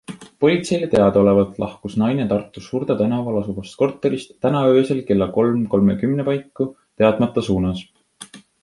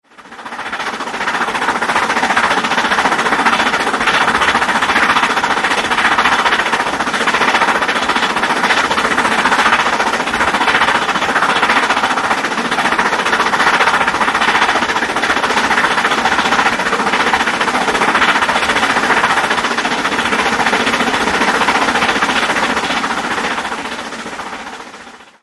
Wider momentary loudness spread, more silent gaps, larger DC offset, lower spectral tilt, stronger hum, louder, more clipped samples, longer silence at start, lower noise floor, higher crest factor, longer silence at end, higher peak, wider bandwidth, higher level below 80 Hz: first, 11 LU vs 6 LU; neither; neither; first, -7.5 dB/octave vs -2 dB/octave; neither; second, -19 LUFS vs -13 LUFS; neither; about the same, 0.1 s vs 0.2 s; first, -42 dBFS vs -36 dBFS; about the same, 16 dB vs 14 dB; about the same, 0.25 s vs 0.2 s; about the same, -2 dBFS vs 0 dBFS; about the same, 11.5 kHz vs 12 kHz; about the same, -46 dBFS vs -44 dBFS